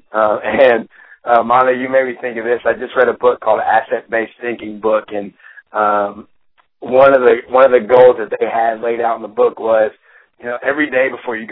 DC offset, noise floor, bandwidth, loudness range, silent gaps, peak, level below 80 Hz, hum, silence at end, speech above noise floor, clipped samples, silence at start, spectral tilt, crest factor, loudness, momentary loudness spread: under 0.1%; -58 dBFS; 4.1 kHz; 5 LU; none; 0 dBFS; -56 dBFS; none; 0 s; 44 dB; under 0.1%; 0.15 s; -8.5 dB/octave; 14 dB; -14 LUFS; 14 LU